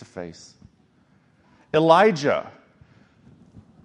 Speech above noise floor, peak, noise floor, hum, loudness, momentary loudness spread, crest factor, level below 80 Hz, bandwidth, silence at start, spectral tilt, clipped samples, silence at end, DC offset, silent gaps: 39 dB; -2 dBFS; -60 dBFS; none; -19 LUFS; 23 LU; 22 dB; -64 dBFS; 9.8 kHz; 0.15 s; -5.5 dB/octave; under 0.1%; 1.35 s; under 0.1%; none